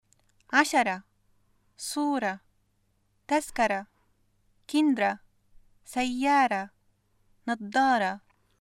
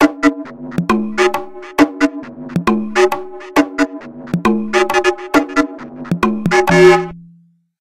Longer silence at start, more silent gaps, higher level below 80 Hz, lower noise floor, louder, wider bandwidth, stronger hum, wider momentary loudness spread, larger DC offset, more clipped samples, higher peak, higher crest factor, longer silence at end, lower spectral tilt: first, 0.5 s vs 0 s; neither; second, -64 dBFS vs -44 dBFS; first, -71 dBFS vs -50 dBFS; second, -27 LUFS vs -15 LUFS; about the same, 15.5 kHz vs 15.5 kHz; neither; about the same, 15 LU vs 13 LU; neither; neither; second, -6 dBFS vs 0 dBFS; first, 22 dB vs 16 dB; second, 0.4 s vs 0.55 s; second, -3.5 dB/octave vs -5.5 dB/octave